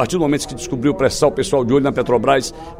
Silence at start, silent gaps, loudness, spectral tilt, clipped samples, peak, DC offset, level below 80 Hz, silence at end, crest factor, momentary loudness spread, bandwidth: 0 s; none; -17 LUFS; -5 dB/octave; under 0.1%; -2 dBFS; under 0.1%; -40 dBFS; 0 s; 16 dB; 5 LU; 16 kHz